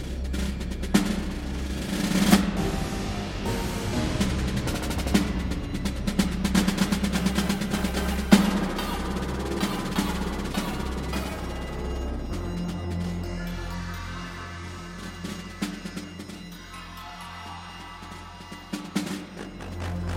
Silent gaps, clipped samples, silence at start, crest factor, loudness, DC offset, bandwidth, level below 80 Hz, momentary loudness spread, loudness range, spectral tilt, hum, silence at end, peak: none; under 0.1%; 0 s; 26 dB; -28 LUFS; under 0.1%; 17 kHz; -36 dBFS; 15 LU; 12 LU; -5 dB/octave; none; 0 s; -2 dBFS